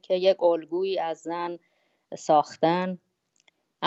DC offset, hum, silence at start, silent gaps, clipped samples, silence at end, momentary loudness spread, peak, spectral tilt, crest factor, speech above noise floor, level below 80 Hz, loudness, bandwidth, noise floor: under 0.1%; none; 0.1 s; none; under 0.1%; 0 s; 16 LU; -8 dBFS; -5.5 dB/octave; 18 dB; 42 dB; -82 dBFS; -26 LUFS; 8.2 kHz; -67 dBFS